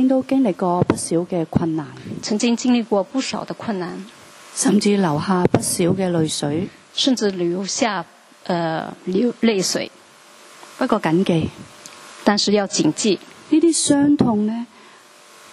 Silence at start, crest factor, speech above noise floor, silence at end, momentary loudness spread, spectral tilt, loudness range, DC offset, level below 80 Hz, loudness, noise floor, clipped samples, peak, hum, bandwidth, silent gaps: 0 s; 20 dB; 27 dB; 0.9 s; 13 LU; -4.5 dB/octave; 4 LU; under 0.1%; -54 dBFS; -19 LUFS; -46 dBFS; under 0.1%; 0 dBFS; none; 13 kHz; none